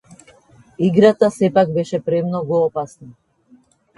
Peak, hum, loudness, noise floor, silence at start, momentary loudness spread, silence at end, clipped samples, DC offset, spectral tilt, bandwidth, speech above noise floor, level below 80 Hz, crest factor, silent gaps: 0 dBFS; none; -17 LUFS; -53 dBFS; 0.8 s; 8 LU; 0.85 s; under 0.1%; under 0.1%; -7.5 dB/octave; 11.5 kHz; 37 dB; -58 dBFS; 18 dB; none